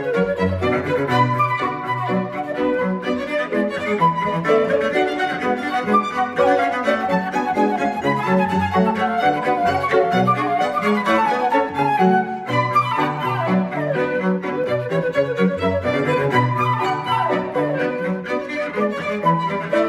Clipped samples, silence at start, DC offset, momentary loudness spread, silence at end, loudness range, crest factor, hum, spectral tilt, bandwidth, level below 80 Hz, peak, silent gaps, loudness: under 0.1%; 0 s; under 0.1%; 5 LU; 0 s; 2 LU; 16 dB; none; -7 dB/octave; 13.5 kHz; -54 dBFS; -4 dBFS; none; -19 LUFS